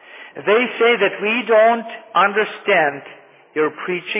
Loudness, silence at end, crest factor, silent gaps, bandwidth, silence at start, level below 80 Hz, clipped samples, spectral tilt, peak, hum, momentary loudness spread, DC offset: -17 LUFS; 0 s; 14 dB; none; 3.9 kHz; 0.1 s; -82 dBFS; under 0.1%; -7.5 dB/octave; -4 dBFS; none; 11 LU; under 0.1%